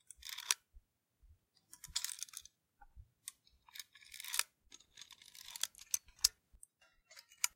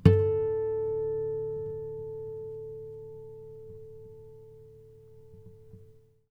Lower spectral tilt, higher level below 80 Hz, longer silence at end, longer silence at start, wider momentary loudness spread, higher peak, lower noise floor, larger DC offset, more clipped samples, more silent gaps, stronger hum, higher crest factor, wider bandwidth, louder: second, 3 dB/octave vs -10 dB/octave; second, -70 dBFS vs -52 dBFS; second, 0.05 s vs 0.4 s; first, 0.2 s vs 0 s; about the same, 24 LU vs 24 LU; second, -10 dBFS vs -4 dBFS; first, -71 dBFS vs -56 dBFS; neither; neither; neither; neither; first, 36 dB vs 28 dB; first, 17 kHz vs 5.6 kHz; second, -39 LUFS vs -32 LUFS